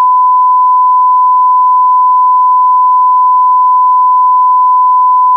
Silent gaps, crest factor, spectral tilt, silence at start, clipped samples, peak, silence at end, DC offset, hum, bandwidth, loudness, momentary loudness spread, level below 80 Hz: none; 4 dB; -4 dB/octave; 0 s; under 0.1%; -4 dBFS; 0 s; under 0.1%; none; 1.2 kHz; -7 LUFS; 0 LU; under -90 dBFS